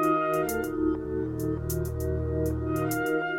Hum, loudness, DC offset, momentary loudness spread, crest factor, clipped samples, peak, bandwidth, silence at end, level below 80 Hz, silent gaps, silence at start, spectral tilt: none; -29 LUFS; under 0.1%; 4 LU; 14 dB; under 0.1%; -14 dBFS; 17 kHz; 0 s; -40 dBFS; none; 0 s; -6.5 dB/octave